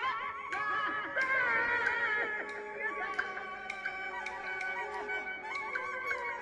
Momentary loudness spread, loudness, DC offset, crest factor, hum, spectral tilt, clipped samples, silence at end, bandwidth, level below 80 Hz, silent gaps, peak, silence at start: 9 LU; -34 LUFS; under 0.1%; 18 dB; none; -3 dB/octave; under 0.1%; 0 s; 12 kHz; -70 dBFS; none; -18 dBFS; 0 s